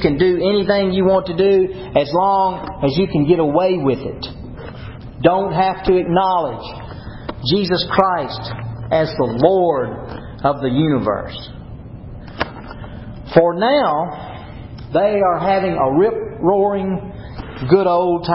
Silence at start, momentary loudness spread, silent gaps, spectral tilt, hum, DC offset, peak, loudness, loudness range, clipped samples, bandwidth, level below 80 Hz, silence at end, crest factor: 0 s; 18 LU; none; -10.5 dB/octave; none; under 0.1%; 0 dBFS; -17 LUFS; 4 LU; under 0.1%; 5.8 kHz; -40 dBFS; 0 s; 18 dB